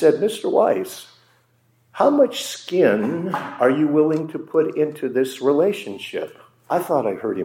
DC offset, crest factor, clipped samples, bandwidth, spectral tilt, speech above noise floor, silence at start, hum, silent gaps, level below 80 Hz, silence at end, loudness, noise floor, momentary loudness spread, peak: under 0.1%; 18 dB; under 0.1%; 17 kHz; -5.5 dB/octave; 41 dB; 0 s; none; none; -78 dBFS; 0 s; -20 LUFS; -61 dBFS; 11 LU; -2 dBFS